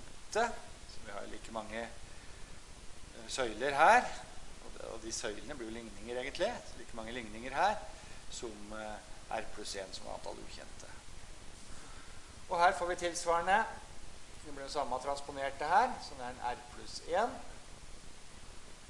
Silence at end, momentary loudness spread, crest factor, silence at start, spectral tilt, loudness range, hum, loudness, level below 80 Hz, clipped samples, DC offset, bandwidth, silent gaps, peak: 0 s; 23 LU; 26 dB; 0 s; -3 dB/octave; 11 LU; none; -36 LUFS; -54 dBFS; under 0.1%; under 0.1%; 11.5 kHz; none; -12 dBFS